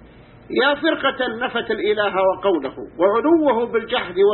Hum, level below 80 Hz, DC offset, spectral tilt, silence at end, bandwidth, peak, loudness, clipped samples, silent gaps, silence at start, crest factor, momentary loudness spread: none; -54 dBFS; under 0.1%; -9.5 dB/octave; 0 s; 4.3 kHz; -4 dBFS; -19 LUFS; under 0.1%; none; 0.05 s; 14 dB; 7 LU